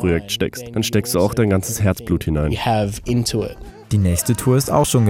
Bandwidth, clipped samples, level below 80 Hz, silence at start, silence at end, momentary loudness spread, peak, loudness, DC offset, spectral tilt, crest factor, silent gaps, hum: 17.5 kHz; under 0.1%; -34 dBFS; 0 s; 0 s; 6 LU; -4 dBFS; -19 LUFS; under 0.1%; -5.5 dB/octave; 14 dB; none; none